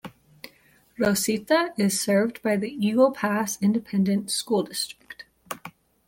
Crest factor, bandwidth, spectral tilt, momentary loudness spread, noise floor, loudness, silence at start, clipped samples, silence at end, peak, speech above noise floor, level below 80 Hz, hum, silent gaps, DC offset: 18 dB; 17 kHz; -4.5 dB/octave; 22 LU; -59 dBFS; -24 LUFS; 0.05 s; under 0.1%; 0.4 s; -8 dBFS; 35 dB; -64 dBFS; none; none; under 0.1%